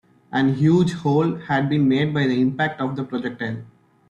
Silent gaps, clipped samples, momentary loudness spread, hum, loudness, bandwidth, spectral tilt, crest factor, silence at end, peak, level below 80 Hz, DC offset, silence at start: none; under 0.1%; 10 LU; none; -21 LUFS; 9.2 kHz; -7.5 dB/octave; 14 dB; 0.45 s; -6 dBFS; -58 dBFS; under 0.1%; 0.3 s